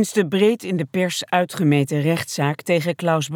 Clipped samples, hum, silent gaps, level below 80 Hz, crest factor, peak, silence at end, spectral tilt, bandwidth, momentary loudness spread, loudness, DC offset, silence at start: under 0.1%; none; none; -68 dBFS; 16 dB; -4 dBFS; 0 s; -5.5 dB/octave; 18 kHz; 5 LU; -20 LUFS; under 0.1%; 0 s